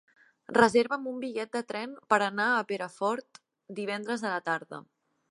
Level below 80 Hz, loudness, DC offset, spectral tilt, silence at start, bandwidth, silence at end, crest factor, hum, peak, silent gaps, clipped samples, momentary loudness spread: -76 dBFS; -29 LUFS; under 0.1%; -4.5 dB/octave; 0.5 s; 11.5 kHz; 0.5 s; 24 dB; none; -6 dBFS; none; under 0.1%; 14 LU